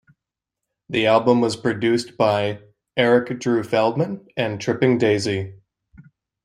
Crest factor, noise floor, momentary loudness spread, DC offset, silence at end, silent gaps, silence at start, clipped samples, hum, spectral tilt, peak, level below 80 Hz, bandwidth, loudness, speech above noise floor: 20 dB; -84 dBFS; 9 LU; under 0.1%; 0.45 s; none; 0.9 s; under 0.1%; none; -6 dB/octave; -2 dBFS; -62 dBFS; 11.5 kHz; -20 LUFS; 65 dB